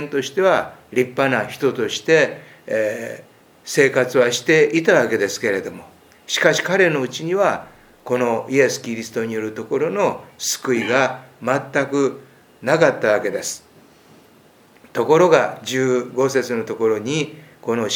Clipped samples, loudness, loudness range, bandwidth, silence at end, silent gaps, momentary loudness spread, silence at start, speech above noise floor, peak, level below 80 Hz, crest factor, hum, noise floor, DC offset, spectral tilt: under 0.1%; -19 LUFS; 4 LU; 20 kHz; 0 s; none; 11 LU; 0 s; 32 dB; 0 dBFS; -66 dBFS; 20 dB; none; -51 dBFS; under 0.1%; -4 dB/octave